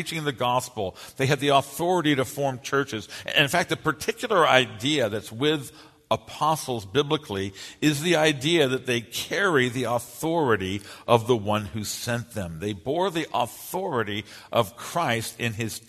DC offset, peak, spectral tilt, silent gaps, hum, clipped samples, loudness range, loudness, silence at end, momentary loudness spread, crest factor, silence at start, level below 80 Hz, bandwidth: under 0.1%; -2 dBFS; -4.5 dB/octave; none; none; under 0.1%; 4 LU; -25 LUFS; 0.1 s; 10 LU; 24 dB; 0 s; -58 dBFS; 13.5 kHz